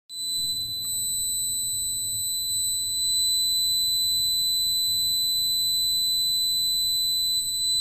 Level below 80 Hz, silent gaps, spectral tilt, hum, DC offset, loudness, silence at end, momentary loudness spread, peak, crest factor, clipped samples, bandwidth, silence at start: -54 dBFS; none; 1.5 dB/octave; none; under 0.1%; -22 LUFS; 0 s; 5 LU; -16 dBFS; 8 dB; under 0.1%; 13 kHz; 0.1 s